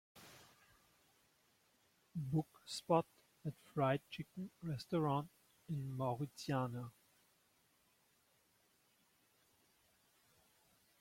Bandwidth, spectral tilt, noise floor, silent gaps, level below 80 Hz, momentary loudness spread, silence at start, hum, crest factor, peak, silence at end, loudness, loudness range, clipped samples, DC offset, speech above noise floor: 16.5 kHz; -6.5 dB/octave; -76 dBFS; none; -78 dBFS; 16 LU; 0.15 s; none; 24 dB; -20 dBFS; 4.1 s; -42 LUFS; 6 LU; under 0.1%; under 0.1%; 36 dB